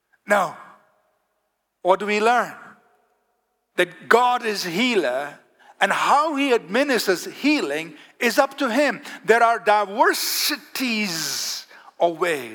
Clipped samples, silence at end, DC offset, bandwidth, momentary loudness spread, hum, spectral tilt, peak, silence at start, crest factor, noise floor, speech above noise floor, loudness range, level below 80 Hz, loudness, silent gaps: under 0.1%; 0 s; under 0.1%; 19.5 kHz; 10 LU; none; -2.5 dB/octave; -2 dBFS; 0.3 s; 20 dB; -74 dBFS; 53 dB; 4 LU; -80 dBFS; -21 LUFS; none